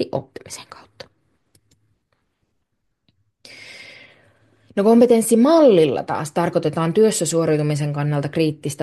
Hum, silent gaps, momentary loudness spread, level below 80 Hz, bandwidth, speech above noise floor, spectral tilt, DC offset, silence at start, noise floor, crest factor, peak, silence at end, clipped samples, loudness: none; none; 23 LU; -64 dBFS; 12.5 kHz; 57 dB; -6 dB/octave; under 0.1%; 0 s; -74 dBFS; 16 dB; -4 dBFS; 0 s; under 0.1%; -17 LUFS